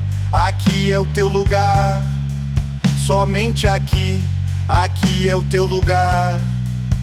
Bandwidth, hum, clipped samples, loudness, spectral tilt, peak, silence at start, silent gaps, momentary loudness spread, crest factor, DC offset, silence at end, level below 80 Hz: 14.5 kHz; none; under 0.1%; -17 LUFS; -6 dB/octave; -2 dBFS; 0 s; none; 6 LU; 14 dB; under 0.1%; 0 s; -26 dBFS